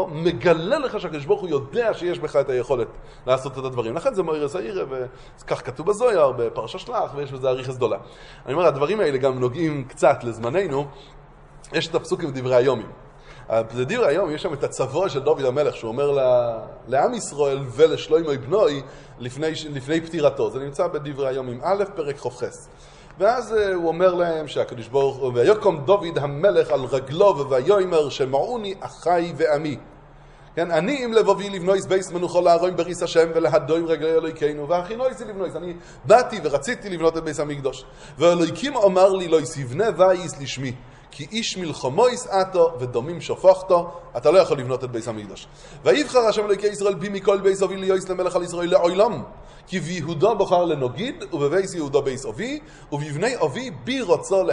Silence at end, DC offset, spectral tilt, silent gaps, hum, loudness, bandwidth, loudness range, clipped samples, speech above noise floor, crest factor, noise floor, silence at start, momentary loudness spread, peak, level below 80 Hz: 0 s; under 0.1%; -5.5 dB/octave; none; none; -22 LUFS; 11 kHz; 4 LU; under 0.1%; 25 dB; 20 dB; -46 dBFS; 0 s; 11 LU; -2 dBFS; -50 dBFS